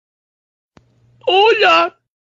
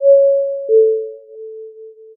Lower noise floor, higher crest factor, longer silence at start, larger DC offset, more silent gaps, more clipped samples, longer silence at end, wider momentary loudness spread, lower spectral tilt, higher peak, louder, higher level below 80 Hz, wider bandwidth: first, -52 dBFS vs -37 dBFS; about the same, 16 dB vs 12 dB; first, 1.25 s vs 0 s; neither; neither; neither; about the same, 0.3 s vs 0.25 s; second, 11 LU vs 23 LU; first, -2.5 dB/octave vs 6 dB/octave; about the same, -2 dBFS vs -2 dBFS; about the same, -13 LUFS vs -14 LUFS; first, -62 dBFS vs under -90 dBFS; first, 7.6 kHz vs 0.7 kHz